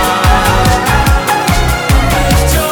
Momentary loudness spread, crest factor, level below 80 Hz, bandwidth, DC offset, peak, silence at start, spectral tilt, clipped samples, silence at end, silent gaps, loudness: 2 LU; 10 dB; -14 dBFS; over 20 kHz; under 0.1%; 0 dBFS; 0 s; -4.5 dB/octave; under 0.1%; 0 s; none; -10 LUFS